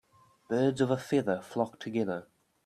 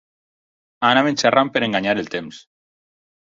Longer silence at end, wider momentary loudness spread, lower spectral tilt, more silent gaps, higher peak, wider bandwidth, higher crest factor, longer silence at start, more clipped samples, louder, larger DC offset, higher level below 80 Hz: second, 0.45 s vs 0.85 s; second, 7 LU vs 13 LU; first, -6.5 dB/octave vs -4 dB/octave; neither; second, -14 dBFS vs -2 dBFS; first, 13.5 kHz vs 7.8 kHz; about the same, 18 dB vs 20 dB; second, 0.5 s vs 0.8 s; neither; second, -31 LUFS vs -18 LUFS; neither; second, -72 dBFS vs -60 dBFS